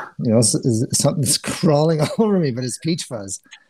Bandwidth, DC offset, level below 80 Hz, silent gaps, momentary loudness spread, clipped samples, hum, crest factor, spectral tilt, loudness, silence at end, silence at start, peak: 16 kHz; under 0.1%; -56 dBFS; none; 9 LU; under 0.1%; none; 16 dB; -5 dB/octave; -18 LUFS; 0.15 s; 0 s; -4 dBFS